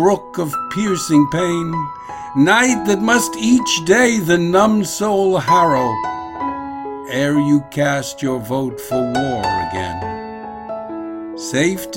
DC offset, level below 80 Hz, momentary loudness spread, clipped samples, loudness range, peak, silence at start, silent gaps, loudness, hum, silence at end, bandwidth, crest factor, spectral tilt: under 0.1%; -48 dBFS; 14 LU; under 0.1%; 7 LU; 0 dBFS; 0 s; none; -17 LUFS; none; 0 s; 16.5 kHz; 16 dB; -4.5 dB/octave